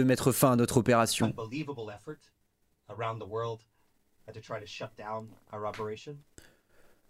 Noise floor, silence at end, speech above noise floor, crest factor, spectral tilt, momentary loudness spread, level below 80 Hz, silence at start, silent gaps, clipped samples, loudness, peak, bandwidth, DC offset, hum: -73 dBFS; 0.9 s; 42 dB; 22 dB; -5 dB/octave; 23 LU; -62 dBFS; 0 s; none; under 0.1%; -31 LUFS; -10 dBFS; 16 kHz; under 0.1%; none